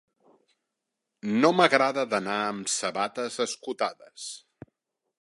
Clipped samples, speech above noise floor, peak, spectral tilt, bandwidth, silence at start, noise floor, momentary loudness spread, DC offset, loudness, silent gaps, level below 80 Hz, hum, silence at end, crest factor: under 0.1%; 58 dB; -4 dBFS; -3.5 dB/octave; 11.5 kHz; 1.25 s; -84 dBFS; 18 LU; under 0.1%; -26 LUFS; none; -76 dBFS; none; 0.85 s; 24 dB